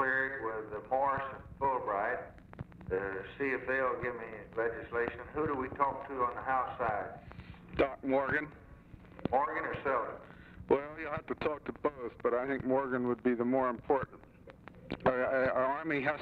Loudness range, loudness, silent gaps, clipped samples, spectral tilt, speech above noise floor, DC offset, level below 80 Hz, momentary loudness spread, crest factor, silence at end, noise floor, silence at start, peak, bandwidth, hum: 3 LU; -34 LUFS; none; under 0.1%; -8.5 dB/octave; 20 dB; under 0.1%; -58 dBFS; 14 LU; 20 dB; 0 s; -54 dBFS; 0 s; -14 dBFS; 5.6 kHz; none